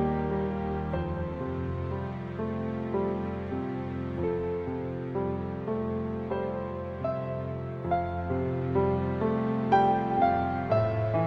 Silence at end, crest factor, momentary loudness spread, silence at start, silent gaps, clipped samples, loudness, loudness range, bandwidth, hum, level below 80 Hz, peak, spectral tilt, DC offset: 0 s; 18 dB; 9 LU; 0 s; none; under 0.1%; -30 LUFS; 6 LU; 6 kHz; none; -48 dBFS; -10 dBFS; -10 dB/octave; under 0.1%